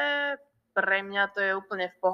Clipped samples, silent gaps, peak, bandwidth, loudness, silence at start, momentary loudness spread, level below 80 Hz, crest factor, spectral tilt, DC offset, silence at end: under 0.1%; none; -12 dBFS; 6.2 kHz; -28 LUFS; 0 s; 7 LU; -82 dBFS; 18 dB; -5 dB/octave; under 0.1%; 0 s